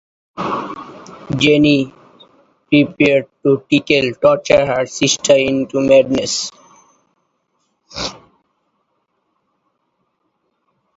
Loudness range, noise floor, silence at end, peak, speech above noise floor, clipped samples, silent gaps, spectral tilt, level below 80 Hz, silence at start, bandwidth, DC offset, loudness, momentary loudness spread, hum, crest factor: 20 LU; -68 dBFS; 2.8 s; 0 dBFS; 54 dB; under 0.1%; none; -4.5 dB/octave; -50 dBFS; 0.35 s; 8 kHz; under 0.1%; -15 LUFS; 15 LU; none; 18 dB